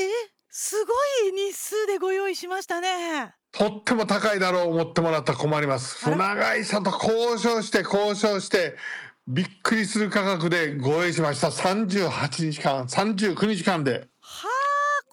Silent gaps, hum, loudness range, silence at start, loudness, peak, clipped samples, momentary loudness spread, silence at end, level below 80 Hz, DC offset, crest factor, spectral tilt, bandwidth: none; none; 2 LU; 0 s; -24 LUFS; -10 dBFS; under 0.1%; 7 LU; 0.1 s; -64 dBFS; under 0.1%; 14 dB; -4.5 dB/octave; over 20 kHz